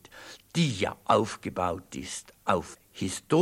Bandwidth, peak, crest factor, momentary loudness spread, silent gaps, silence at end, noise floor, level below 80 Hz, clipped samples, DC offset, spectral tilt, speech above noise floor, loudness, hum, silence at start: 16 kHz; -6 dBFS; 22 dB; 13 LU; none; 0 s; -49 dBFS; -58 dBFS; under 0.1%; under 0.1%; -5 dB/octave; 21 dB; -30 LUFS; none; 0.15 s